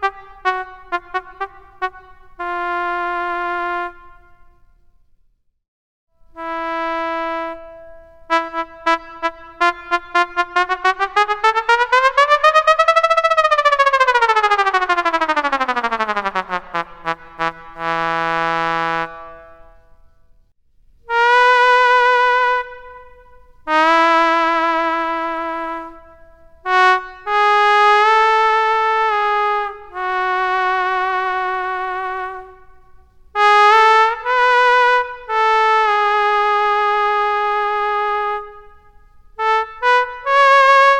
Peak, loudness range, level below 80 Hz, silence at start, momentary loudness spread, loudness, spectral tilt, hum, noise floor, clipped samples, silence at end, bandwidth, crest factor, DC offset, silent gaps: 0 dBFS; 11 LU; -50 dBFS; 0 s; 14 LU; -16 LUFS; -2.5 dB/octave; none; -58 dBFS; under 0.1%; 0 s; 12 kHz; 16 dB; under 0.1%; 5.68-6.07 s